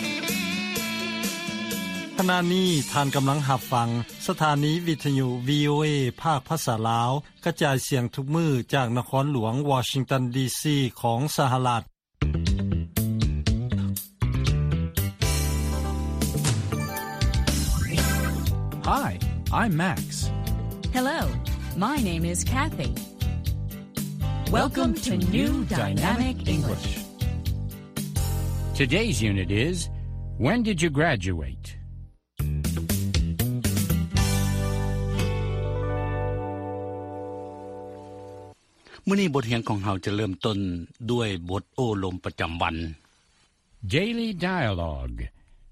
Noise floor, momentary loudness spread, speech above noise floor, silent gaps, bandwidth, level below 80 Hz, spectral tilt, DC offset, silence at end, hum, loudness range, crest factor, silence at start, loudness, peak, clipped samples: -64 dBFS; 9 LU; 39 dB; none; 15.5 kHz; -34 dBFS; -5 dB/octave; under 0.1%; 0 s; none; 4 LU; 18 dB; 0 s; -26 LUFS; -8 dBFS; under 0.1%